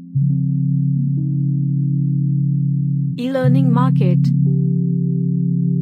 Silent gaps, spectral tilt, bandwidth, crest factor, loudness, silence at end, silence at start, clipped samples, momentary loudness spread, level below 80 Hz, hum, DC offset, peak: none; -10.5 dB/octave; 4.5 kHz; 12 dB; -17 LUFS; 0 s; 0 s; under 0.1%; 4 LU; -62 dBFS; none; under 0.1%; -4 dBFS